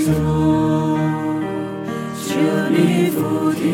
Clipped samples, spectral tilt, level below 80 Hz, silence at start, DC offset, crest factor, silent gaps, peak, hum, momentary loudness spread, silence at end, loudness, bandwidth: under 0.1%; -6.5 dB/octave; -42 dBFS; 0 s; under 0.1%; 16 dB; none; -2 dBFS; none; 9 LU; 0 s; -19 LUFS; 16.5 kHz